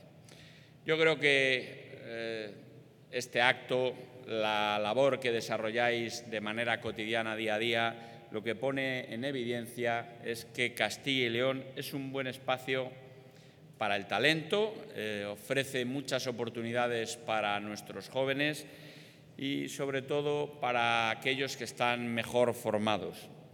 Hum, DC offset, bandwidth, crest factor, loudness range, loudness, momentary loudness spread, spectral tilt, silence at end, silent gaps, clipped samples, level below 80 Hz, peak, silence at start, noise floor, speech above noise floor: none; under 0.1%; 19 kHz; 24 dB; 4 LU; -33 LUFS; 12 LU; -4 dB/octave; 0.05 s; none; under 0.1%; -80 dBFS; -10 dBFS; 0.05 s; -56 dBFS; 23 dB